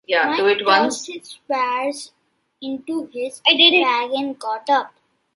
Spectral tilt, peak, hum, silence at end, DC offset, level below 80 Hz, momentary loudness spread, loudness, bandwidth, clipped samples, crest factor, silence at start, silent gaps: -1.5 dB/octave; 0 dBFS; none; 0.5 s; under 0.1%; -72 dBFS; 21 LU; -18 LUFS; 11.5 kHz; under 0.1%; 20 dB; 0.1 s; none